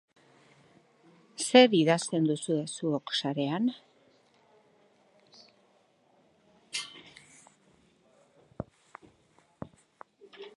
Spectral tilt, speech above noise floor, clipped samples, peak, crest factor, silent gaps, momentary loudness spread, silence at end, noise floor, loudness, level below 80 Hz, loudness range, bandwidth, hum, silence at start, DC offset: -4.5 dB/octave; 41 dB; under 0.1%; -6 dBFS; 26 dB; none; 27 LU; 0.1 s; -67 dBFS; -27 LUFS; -70 dBFS; 21 LU; 11.5 kHz; none; 1.4 s; under 0.1%